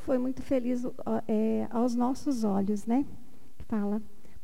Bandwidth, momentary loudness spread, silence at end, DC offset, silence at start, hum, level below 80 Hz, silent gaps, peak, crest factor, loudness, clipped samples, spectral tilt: 15.5 kHz; 5 LU; 0.35 s; 2%; 0 s; none; -56 dBFS; none; -18 dBFS; 14 dB; -30 LUFS; under 0.1%; -7.5 dB/octave